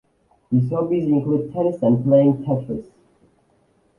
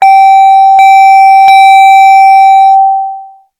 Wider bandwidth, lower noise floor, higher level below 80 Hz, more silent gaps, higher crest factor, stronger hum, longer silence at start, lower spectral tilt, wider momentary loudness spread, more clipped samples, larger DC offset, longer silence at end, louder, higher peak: second, 3.3 kHz vs 14 kHz; first, -61 dBFS vs -25 dBFS; first, -56 dBFS vs -62 dBFS; neither; first, 18 dB vs 2 dB; neither; first, 0.5 s vs 0 s; first, -11.5 dB/octave vs 2.5 dB/octave; first, 9 LU vs 5 LU; second, under 0.1% vs 40%; neither; first, 1.15 s vs 0.35 s; second, -20 LUFS vs -2 LUFS; second, -4 dBFS vs 0 dBFS